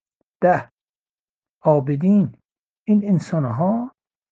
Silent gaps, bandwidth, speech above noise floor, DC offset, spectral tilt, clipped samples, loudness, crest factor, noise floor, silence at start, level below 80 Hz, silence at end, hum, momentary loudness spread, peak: 0.71-0.78 s, 0.95-1.42 s, 1.49-1.61 s, 2.59-2.86 s; 7.6 kHz; over 72 dB; under 0.1%; -9.5 dB/octave; under 0.1%; -20 LUFS; 18 dB; under -90 dBFS; 0.4 s; -62 dBFS; 0.45 s; none; 8 LU; -2 dBFS